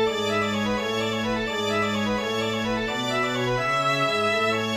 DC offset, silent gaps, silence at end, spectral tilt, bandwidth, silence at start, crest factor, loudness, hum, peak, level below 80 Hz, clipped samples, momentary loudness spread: under 0.1%; none; 0 s; -4.5 dB/octave; 15.5 kHz; 0 s; 14 dB; -24 LUFS; none; -12 dBFS; -50 dBFS; under 0.1%; 4 LU